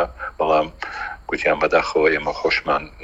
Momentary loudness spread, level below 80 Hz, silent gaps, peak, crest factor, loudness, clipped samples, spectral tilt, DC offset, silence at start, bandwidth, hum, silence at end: 11 LU; -44 dBFS; none; -4 dBFS; 18 dB; -20 LUFS; under 0.1%; -4.5 dB/octave; under 0.1%; 0 s; 8 kHz; none; 0 s